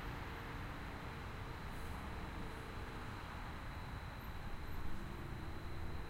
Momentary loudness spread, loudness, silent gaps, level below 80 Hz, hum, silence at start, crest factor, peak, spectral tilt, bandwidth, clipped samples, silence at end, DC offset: 1 LU; -48 LUFS; none; -50 dBFS; none; 0 s; 14 dB; -32 dBFS; -6 dB/octave; 16 kHz; under 0.1%; 0 s; under 0.1%